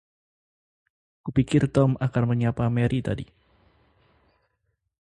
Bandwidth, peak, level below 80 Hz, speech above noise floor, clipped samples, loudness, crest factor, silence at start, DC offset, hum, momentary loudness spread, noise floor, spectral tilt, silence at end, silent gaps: 9.8 kHz; -6 dBFS; -50 dBFS; 53 dB; under 0.1%; -24 LUFS; 20 dB; 1.25 s; under 0.1%; none; 12 LU; -76 dBFS; -8 dB/octave; 1.8 s; none